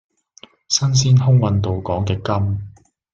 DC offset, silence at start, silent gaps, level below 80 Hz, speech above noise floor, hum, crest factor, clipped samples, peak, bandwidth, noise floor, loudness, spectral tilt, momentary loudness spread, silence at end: under 0.1%; 0.7 s; none; -48 dBFS; 31 dB; none; 16 dB; under 0.1%; -2 dBFS; 7.6 kHz; -48 dBFS; -18 LUFS; -5.5 dB/octave; 10 LU; 0.45 s